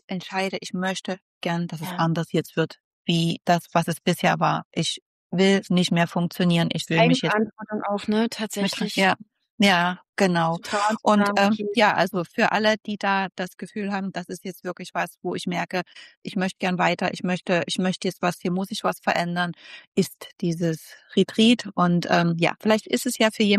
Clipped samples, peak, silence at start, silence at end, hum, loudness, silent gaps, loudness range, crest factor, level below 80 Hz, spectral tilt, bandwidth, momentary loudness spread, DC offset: under 0.1%; -6 dBFS; 0.1 s; 0 s; none; -23 LUFS; 1.22-1.41 s, 2.84-3.05 s, 4.65-4.71 s, 5.02-5.30 s, 9.50-9.58 s, 10.09-10.13 s, 16.17-16.22 s, 19.87-19.92 s; 5 LU; 18 dB; -68 dBFS; -5 dB/octave; 14 kHz; 11 LU; under 0.1%